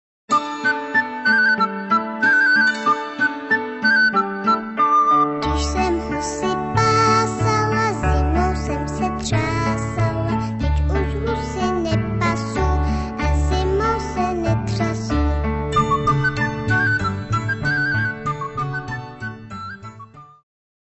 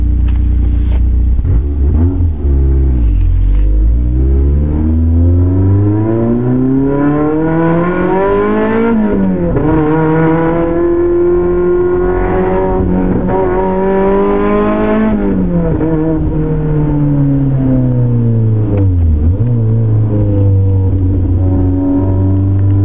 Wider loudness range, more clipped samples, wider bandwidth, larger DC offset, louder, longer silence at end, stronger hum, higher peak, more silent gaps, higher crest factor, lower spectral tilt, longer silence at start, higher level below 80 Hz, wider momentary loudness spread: first, 5 LU vs 1 LU; neither; first, 8.4 kHz vs 3.7 kHz; second, under 0.1% vs 6%; second, -19 LUFS vs -12 LUFS; first, 0.55 s vs 0 s; neither; about the same, -6 dBFS vs -4 dBFS; neither; first, 14 dB vs 8 dB; second, -5.5 dB/octave vs -13.5 dB/octave; first, 0.3 s vs 0 s; second, -28 dBFS vs -16 dBFS; first, 9 LU vs 3 LU